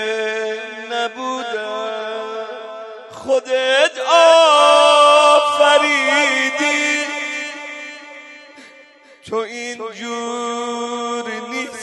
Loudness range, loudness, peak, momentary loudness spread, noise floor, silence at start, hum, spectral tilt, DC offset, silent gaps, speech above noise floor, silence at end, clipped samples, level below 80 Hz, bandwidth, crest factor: 15 LU; -15 LUFS; 0 dBFS; 20 LU; -46 dBFS; 0 s; none; -0.5 dB/octave; under 0.1%; none; 33 dB; 0 s; under 0.1%; -72 dBFS; 11.5 kHz; 16 dB